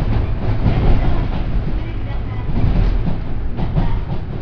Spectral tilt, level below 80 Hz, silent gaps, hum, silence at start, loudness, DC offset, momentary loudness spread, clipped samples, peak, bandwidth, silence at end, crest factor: -9.5 dB/octave; -18 dBFS; none; none; 0 s; -21 LUFS; under 0.1%; 8 LU; under 0.1%; -2 dBFS; 5.4 kHz; 0 s; 14 dB